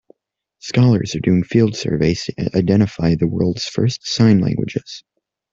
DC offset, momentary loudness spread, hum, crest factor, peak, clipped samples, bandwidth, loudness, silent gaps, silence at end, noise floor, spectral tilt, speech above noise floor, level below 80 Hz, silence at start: under 0.1%; 9 LU; none; 16 dB; -2 dBFS; under 0.1%; 7.6 kHz; -17 LUFS; none; 0.55 s; -71 dBFS; -6.5 dB/octave; 55 dB; -46 dBFS; 0.65 s